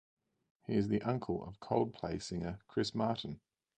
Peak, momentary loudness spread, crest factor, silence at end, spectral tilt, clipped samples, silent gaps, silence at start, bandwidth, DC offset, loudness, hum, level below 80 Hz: -18 dBFS; 7 LU; 20 dB; 0.4 s; -6.5 dB/octave; under 0.1%; none; 0.7 s; 9.4 kHz; under 0.1%; -37 LUFS; none; -60 dBFS